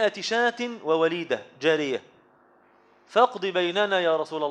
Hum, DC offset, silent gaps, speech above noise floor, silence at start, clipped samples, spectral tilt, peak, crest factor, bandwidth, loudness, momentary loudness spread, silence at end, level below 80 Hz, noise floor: none; under 0.1%; none; 34 dB; 0 s; under 0.1%; -4 dB/octave; -6 dBFS; 20 dB; 9.2 kHz; -25 LUFS; 8 LU; 0 s; -80 dBFS; -59 dBFS